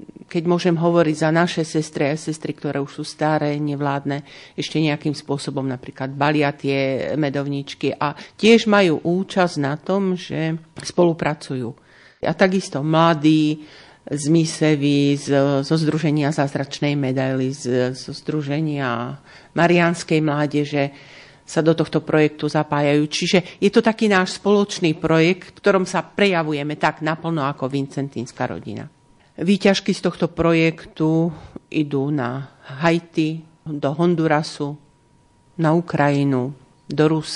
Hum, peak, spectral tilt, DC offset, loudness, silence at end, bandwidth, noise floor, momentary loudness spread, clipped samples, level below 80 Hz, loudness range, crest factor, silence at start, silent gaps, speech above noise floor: none; -2 dBFS; -6 dB/octave; under 0.1%; -20 LUFS; 0 s; 11 kHz; -56 dBFS; 10 LU; under 0.1%; -58 dBFS; 5 LU; 18 dB; 0.3 s; none; 36 dB